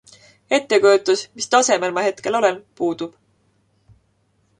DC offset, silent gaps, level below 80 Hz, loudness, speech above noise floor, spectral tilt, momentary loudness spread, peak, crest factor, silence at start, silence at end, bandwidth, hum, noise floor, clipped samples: under 0.1%; none; -66 dBFS; -19 LUFS; 46 dB; -2.5 dB/octave; 10 LU; -2 dBFS; 18 dB; 0.5 s; 1.5 s; 11 kHz; none; -64 dBFS; under 0.1%